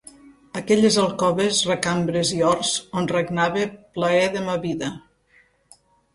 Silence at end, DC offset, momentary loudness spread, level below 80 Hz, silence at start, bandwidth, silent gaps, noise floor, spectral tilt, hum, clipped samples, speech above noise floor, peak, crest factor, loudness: 1.15 s; under 0.1%; 10 LU; -56 dBFS; 0.55 s; 11.5 kHz; none; -59 dBFS; -4 dB/octave; none; under 0.1%; 38 dB; -2 dBFS; 20 dB; -21 LUFS